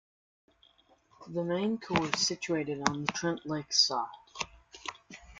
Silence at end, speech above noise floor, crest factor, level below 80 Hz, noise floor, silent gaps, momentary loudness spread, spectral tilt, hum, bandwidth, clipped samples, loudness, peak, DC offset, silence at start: 0 s; 34 dB; 30 dB; -64 dBFS; -65 dBFS; none; 17 LU; -3 dB/octave; none; 11.5 kHz; under 0.1%; -31 LUFS; -4 dBFS; under 0.1%; 1.2 s